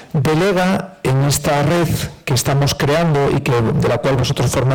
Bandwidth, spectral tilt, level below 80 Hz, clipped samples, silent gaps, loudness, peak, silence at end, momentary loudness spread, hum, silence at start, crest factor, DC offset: 19.5 kHz; -5.5 dB/octave; -38 dBFS; under 0.1%; none; -16 LUFS; -10 dBFS; 0 s; 4 LU; none; 0 s; 6 dB; under 0.1%